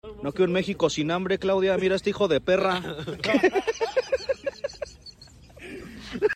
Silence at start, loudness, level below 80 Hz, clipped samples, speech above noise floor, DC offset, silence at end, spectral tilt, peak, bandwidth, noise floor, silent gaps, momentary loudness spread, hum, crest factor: 0.05 s; -25 LUFS; -52 dBFS; under 0.1%; 25 dB; under 0.1%; 0 s; -5 dB/octave; -8 dBFS; 12.5 kHz; -49 dBFS; none; 18 LU; none; 18 dB